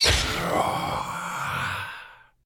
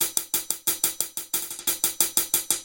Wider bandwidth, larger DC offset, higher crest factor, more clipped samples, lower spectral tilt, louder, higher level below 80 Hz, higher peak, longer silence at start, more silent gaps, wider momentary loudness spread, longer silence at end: first, 19.5 kHz vs 17 kHz; neither; second, 18 dB vs 26 dB; neither; first, -2.5 dB/octave vs 1 dB/octave; about the same, -26 LUFS vs -24 LUFS; first, -38 dBFS vs -60 dBFS; second, -8 dBFS vs 0 dBFS; about the same, 0 s vs 0 s; neither; first, 13 LU vs 6 LU; first, 0.3 s vs 0 s